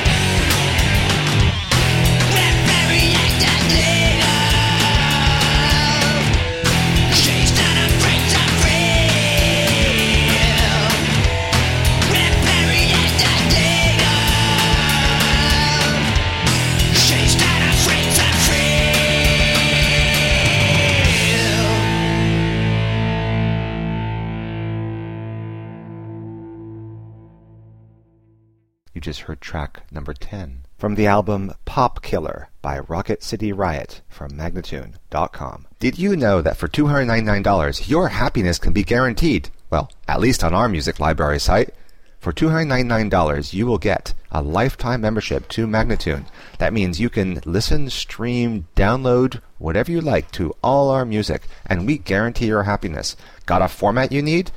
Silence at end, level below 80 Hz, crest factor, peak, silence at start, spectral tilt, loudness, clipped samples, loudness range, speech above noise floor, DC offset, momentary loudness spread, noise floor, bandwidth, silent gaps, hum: 0 s; -26 dBFS; 16 dB; -2 dBFS; 0 s; -4 dB/octave; -16 LUFS; under 0.1%; 12 LU; 39 dB; under 0.1%; 15 LU; -58 dBFS; 16.5 kHz; none; none